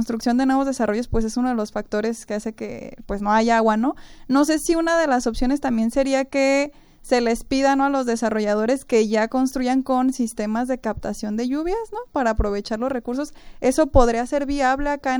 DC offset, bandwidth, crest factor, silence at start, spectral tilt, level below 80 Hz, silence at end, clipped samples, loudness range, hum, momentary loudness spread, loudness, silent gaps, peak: under 0.1%; over 20 kHz; 20 dB; 0 s; -5 dB/octave; -34 dBFS; 0 s; under 0.1%; 3 LU; none; 10 LU; -21 LUFS; none; 0 dBFS